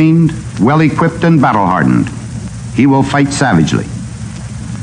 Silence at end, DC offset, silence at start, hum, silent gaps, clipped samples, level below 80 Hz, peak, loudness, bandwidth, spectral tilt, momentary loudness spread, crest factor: 0 s; under 0.1%; 0 s; none; none; under 0.1%; -34 dBFS; 0 dBFS; -11 LUFS; 10.5 kHz; -6.5 dB/octave; 14 LU; 10 dB